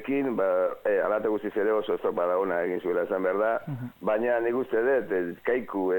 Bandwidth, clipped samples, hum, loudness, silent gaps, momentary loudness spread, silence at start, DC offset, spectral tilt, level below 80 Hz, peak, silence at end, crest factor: 17.5 kHz; under 0.1%; none; -27 LUFS; none; 4 LU; 0 s; under 0.1%; -8 dB/octave; -66 dBFS; -14 dBFS; 0 s; 14 dB